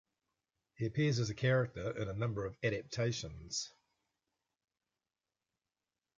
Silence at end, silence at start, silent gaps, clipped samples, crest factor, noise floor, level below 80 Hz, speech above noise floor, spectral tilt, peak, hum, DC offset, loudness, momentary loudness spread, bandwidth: 2.5 s; 0.8 s; none; under 0.1%; 20 dB; under -90 dBFS; -62 dBFS; over 54 dB; -5.5 dB/octave; -20 dBFS; none; under 0.1%; -37 LUFS; 8 LU; 7.8 kHz